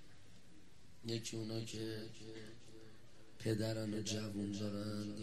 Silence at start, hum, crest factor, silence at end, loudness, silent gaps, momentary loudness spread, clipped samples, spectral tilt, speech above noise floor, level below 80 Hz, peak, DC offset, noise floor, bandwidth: 0 s; none; 18 dB; 0 s; -43 LUFS; none; 23 LU; under 0.1%; -5 dB/octave; 22 dB; -72 dBFS; -26 dBFS; 0.2%; -64 dBFS; 14.5 kHz